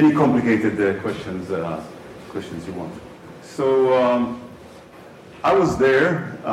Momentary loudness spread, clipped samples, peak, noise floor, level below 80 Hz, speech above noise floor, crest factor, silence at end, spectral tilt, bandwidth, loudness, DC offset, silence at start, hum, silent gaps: 20 LU; under 0.1%; -8 dBFS; -43 dBFS; -52 dBFS; 23 dB; 14 dB; 0 s; -7 dB/octave; 12.5 kHz; -20 LUFS; under 0.1%; 0 s; none; none